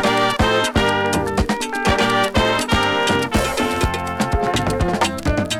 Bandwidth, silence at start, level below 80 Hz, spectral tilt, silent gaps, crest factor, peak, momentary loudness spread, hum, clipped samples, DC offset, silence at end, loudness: 18.5 kHz; 0 s; -30 dBFS; -4.5 dB/octave; none; 10 dB; -8 dBFS; 4 LU; none; under 0.1%; under 0.1%; 0 s; -18 LUFS